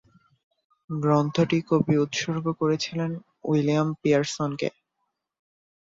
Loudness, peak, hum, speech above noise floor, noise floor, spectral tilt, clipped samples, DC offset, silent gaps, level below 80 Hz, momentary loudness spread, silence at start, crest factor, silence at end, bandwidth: -25 LUFS; -8 dBFS; none; 55 dB; -79 dBFS; -6 dB/octave; under 0.1%; under 0.1%; none; -64 dBFS; 9 LU; 0.9 s; 18 dB; 1.25 s; 7.8 kHz